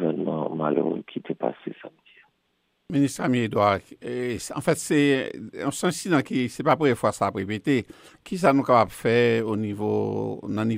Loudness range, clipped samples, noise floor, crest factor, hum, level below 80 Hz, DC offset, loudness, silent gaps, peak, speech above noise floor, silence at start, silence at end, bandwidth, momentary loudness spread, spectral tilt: 4 LU; under 0.1%; -72 dBFS; 18 dB; none; -62 dBFS; under 0.1%; -24 LUFS; none; -6 dBFS; 48 dB; 0 s; 0 s; 16 kHz; 10 LU; -5.5 dB/octave